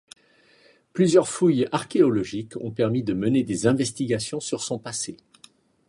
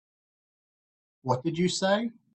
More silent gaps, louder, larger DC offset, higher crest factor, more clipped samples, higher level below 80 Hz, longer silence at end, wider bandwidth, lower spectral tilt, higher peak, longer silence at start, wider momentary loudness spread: neither; first, -23 LUFS vs -28 LUFS; neither; about the same, 20 dB vs 20 dB; neither; first, -60 dBFS vs -66 dBFS; first, 0.75 s vs 0.25 s; first, 11.5 kHz vs 8.8 kHz; about the same, -5.5 dB/octave vs -5 dB/octave; first, -4 dBFS vs -10 dBFS; second, 0.95 s vs 1.25 s; first, 12 LU vs 6 LU